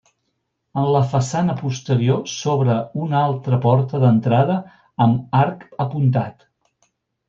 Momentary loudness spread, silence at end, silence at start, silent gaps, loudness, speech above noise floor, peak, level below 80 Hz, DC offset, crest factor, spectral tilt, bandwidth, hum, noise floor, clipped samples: 9 LU; 0.95 s; 0.75 s; none; -19 LUFS; 55 dB; -4 dBFS; -60 dBFS; under 0.1%; 16 dB; -7.5 dB/octave; 7.6 kHz; none; -73 dBFS; under 0.1%